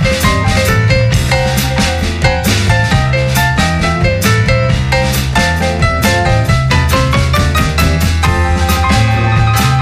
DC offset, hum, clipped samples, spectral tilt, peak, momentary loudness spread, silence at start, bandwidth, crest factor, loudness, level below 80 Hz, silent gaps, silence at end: under 0.1%; none; under 0.1%; -5 dB/octave; 0 dBFS; 2 LU; 0 s; 16 kHz; 10 dB; -11 LUFS; -18 dBFS; none; 0 s